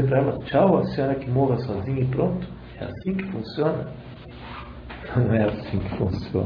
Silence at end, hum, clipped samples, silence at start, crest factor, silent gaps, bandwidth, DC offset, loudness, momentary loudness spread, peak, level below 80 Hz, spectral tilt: 0 s; none; under 0.1%; 0 s; 18 dB; none; 5.4 kHz; under 0.1%; -24 LUFS; 17 LU; -6 dBFS; -44 dBFS; -10.5 dB/octave